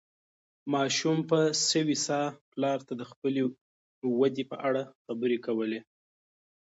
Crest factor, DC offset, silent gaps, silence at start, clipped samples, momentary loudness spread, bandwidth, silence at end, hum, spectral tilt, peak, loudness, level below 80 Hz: 18 dB; under 0.1%; 2.41-2.52 s, 3.16-3.22 s, 3.61-4.02 s, 4.95-5.05 s; 0.65 s; under 0.1%; 9 LU; 8 kHz; 0.85 s; none; -4 dB/octave; -12 dBFS; -29 LUFS; -80 dBFS